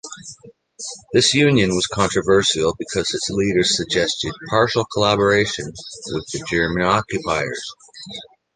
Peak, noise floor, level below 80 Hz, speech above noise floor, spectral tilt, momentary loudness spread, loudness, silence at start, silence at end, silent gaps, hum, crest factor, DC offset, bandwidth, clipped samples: -2 dBFS; -45 dBFS; -46 dBFS; 25 dB; -4 dB/octave; 18 LU; -19 LUFS; 0.05 s; 0.3 s; none; none; 18 dB; under 0.1%; 10 kHz; under 0.1%